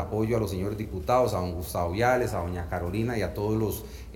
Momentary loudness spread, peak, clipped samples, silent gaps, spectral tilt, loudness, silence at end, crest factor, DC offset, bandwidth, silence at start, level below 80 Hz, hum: 8 LU; -10 dBFS; under 0.1%; none; -6.5 dB/octave; -28 LUFS; 0 s; 18 dB; under 0.1%; 17 kHz; 0 s; -42 dBFS; none